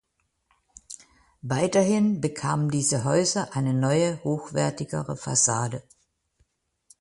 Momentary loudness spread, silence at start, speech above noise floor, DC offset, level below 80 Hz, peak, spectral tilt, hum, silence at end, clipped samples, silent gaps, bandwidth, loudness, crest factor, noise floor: 17 LU; 0.9 s; 47 dB; under 0.1%; -60 dBFS; -8 dBFS; -4.5 dB/octave; none; 1.2 s; under 0.1%; none; 11.5 kHz; -24 LUFS; 18 dB; -71 dBFS